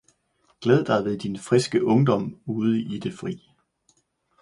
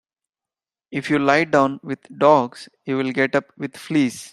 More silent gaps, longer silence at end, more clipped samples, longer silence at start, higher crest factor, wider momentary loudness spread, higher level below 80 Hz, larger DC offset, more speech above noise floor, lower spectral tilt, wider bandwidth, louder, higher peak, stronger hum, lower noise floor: neither; first, 1.05 s vs 0.05 s; neither; second, 0.6 s vs 0.9 s; about the same, 20 dB vs 20 dB; second, 11 LU vs 15 LU; about the same, -62 dBFS vs -64 dBFS; neither; second, 44 dB vs over 70 dB; first, -7 dB/octave vs -5.5 dB/octave; second, 11.5 kHz vs 13 kHz; second, -24 LUFS vs -19 LUFS; second, -6 dBFS vs -2 dBFS; neither; second, -67 dBFS vs under -90 dBFS